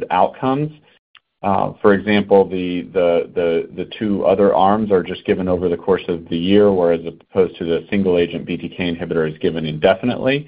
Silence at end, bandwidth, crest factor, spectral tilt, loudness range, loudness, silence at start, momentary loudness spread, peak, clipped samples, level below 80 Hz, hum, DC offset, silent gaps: 0.05 s; 5 kHz; 16 dB; -11 dB/octave; 2 LU; -18 LUFS; 0 s; 9 LU; 0 dBFS; under 0.1%; -48 dBFS; none; under 0.1%; 0.99-1.14 s